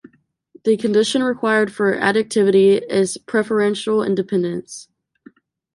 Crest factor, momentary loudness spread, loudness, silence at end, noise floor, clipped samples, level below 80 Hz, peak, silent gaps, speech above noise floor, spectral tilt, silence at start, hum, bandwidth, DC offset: 16 dB; 9 LU; -18 LUFS; 0.9 s; -51 dBFS; under 0.1%; -64 dBFS; -4 dBFS; none; 33 dB; -5 dB/octave; 0.65 s; none; 11.5 kHz; under 0.1%